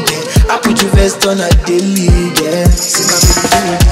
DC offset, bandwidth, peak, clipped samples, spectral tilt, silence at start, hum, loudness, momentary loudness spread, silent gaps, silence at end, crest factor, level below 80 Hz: under 0.1%; 16.5 kHz; 0 dBFS; under 0.1%; -4 dB/octave; 0 s; none; -10 LUFS; 4 LU; none; 0 s; 10 dB; -14 dBFS